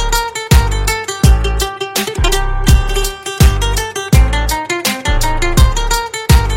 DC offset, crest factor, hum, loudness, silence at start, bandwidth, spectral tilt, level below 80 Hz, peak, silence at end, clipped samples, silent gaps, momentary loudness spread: under 0.1%; 12 dB; none; -14 LUFS; 0 s; 16.5 kHz; -4 dB/octave; -14 dBFS; 0 dBFS; 0 s; under 0.1%; none; 5 LU